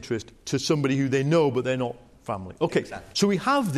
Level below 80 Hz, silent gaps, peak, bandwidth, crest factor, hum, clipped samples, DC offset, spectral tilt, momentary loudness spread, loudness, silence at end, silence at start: -58 dBFS; none; -8 dBFS; 14.5 kHz; 16 dB; none; under 0.1%; under 0.1%; -5.5 dB/octave; 12 LU; -25 LUFS; 0 s; 0 s